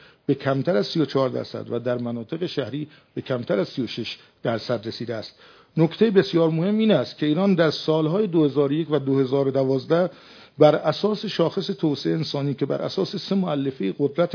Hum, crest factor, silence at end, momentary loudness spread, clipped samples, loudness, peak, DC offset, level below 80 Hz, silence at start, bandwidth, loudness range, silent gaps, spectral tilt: none; 22 dB; 0 s; 11 LU; under 0.1%; -23 LUFS; -2 dBFS; under 0.1%; -70 dBFS; 0.3 s; 5.4 kHz; 7 LU; none; -7.5 dB/octave